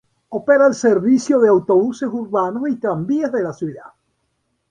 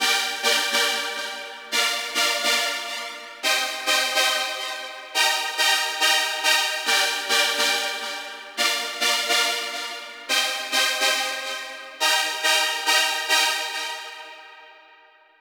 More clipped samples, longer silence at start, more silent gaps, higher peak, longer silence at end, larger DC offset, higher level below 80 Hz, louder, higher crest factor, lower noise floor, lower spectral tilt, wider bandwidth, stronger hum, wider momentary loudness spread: neither; first, 0.3 s vs 0 s; neither; about the same, -2 dBFS vs -4 dBFS; first, 0.85 s vs 0.65 s; neither; first, -60 dBFS vs -72 dBFS; first, -17 LUFS vs -21 LUFS; second, 14 dB vs 20 dB; first, -69 dBFS vs -53 dBFS; first, -6.5 dB/octave vs 3 dB/octave; second, 9.8 kHz vs over 20 kHz; neither; about the same, 11 LU vs 12 LU